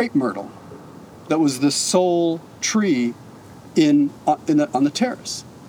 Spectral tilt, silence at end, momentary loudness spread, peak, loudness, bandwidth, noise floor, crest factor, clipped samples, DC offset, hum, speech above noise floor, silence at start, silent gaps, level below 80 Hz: -4.5 dB/octave; 0 s; 17 LU; -6 dBFS; -20 LUFS; 17 kHz; -41 dBFS; 14 dB; under 0.1%; under 0.1%; none; 22 dB; 0 s; none; -66 dBFS